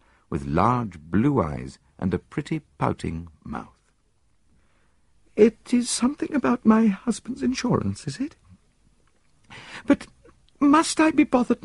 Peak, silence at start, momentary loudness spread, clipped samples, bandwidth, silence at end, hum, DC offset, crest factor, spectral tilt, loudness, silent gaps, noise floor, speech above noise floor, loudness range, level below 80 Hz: -4 dBFS; 0.3 s; 17 LU; under 0.1%; 11.5 kHz; 0.1 s; none; under 0.1%; 20 dB; -5.5 dB/octave; -23 LUFS; none; -67 dBFS; 44 dB; 9 LU; -50 dBFS